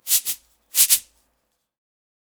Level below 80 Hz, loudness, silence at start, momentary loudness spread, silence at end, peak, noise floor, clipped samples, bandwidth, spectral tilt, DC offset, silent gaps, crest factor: -66 dBFS; -18 LUFS; 0.05 s; 13 LU; 1.4 s; 0 dBFS; -73 dBFS; under 0.1%; over 20 kHz; 4.5 dB/octave; under 0.1%; none; 24 dB